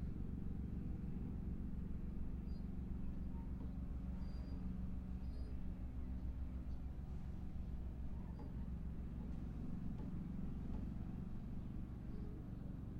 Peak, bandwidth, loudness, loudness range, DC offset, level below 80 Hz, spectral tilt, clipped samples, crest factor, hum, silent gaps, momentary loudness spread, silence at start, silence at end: -34 dBFS; 5.2 kHz; -49 LUFS; 1 LU; under 0.1%; -48 dBFS; -9.5 dB/octave; under 0.1%; 12 dB; none; none; 3 LU; 0 s; 0 s